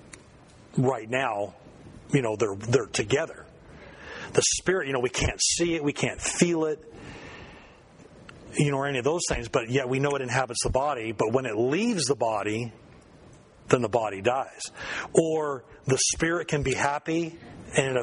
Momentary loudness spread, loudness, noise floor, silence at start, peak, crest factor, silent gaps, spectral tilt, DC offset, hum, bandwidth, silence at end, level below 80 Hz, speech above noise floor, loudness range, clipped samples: 13 LU; -26 LUFS; -52 dBFS; 0.05 s; -4 dBFS; 24 dB; none; -4 dB/octave; under 0.1%; none; 11 kHz; 0 s; -48 dBFS; 26 dB; 3 LU; under 0.1%